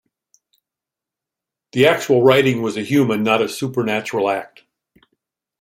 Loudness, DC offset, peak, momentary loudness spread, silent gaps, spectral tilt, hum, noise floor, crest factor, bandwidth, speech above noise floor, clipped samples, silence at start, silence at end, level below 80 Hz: -17 LUFS; under 0.1%; -2 dBFS; 9 LU; none; -5.5 dB/octave; none; -87 dBFS; 18 dB; 16 kHz; 70 dB; under 0.1%; 1.75 s; 1.15 s; -62 dBFS